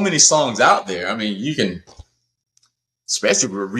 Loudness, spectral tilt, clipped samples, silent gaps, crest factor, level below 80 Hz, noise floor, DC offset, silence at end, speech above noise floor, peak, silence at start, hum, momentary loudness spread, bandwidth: -17 LUFS; -2 dB/octave; under 0.1%; none; 18 dB; -56 dBFS; -66 dBFS; under 0.1%; 0 s; 48 dB; -2 dBFS; 0 s; none; 12 LU; 13.5 kHz